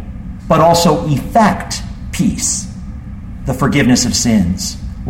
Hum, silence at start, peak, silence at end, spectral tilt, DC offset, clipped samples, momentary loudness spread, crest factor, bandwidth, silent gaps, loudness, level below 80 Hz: none; 0 s; 0 dBFS; 0 s; -4.5 dB/octave; under 0.1%; under 0.1%; 18 LU; 14 dB; 16.5 kHz; none; -14 LUFS; -28 dBFS